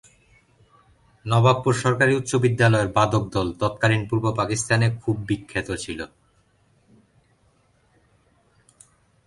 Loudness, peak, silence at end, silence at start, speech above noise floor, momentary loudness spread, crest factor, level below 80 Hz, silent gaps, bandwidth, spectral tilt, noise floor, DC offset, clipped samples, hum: -22 LUFS; -4 dBFS; 3.2 s; 1.25 s; 41 dB; 11 LU; 20 dB; -50 dBFS; none; 11.5 kHz; -5.5 dB/octave; -62 dBFS; under 0.1%; under 0.1%; none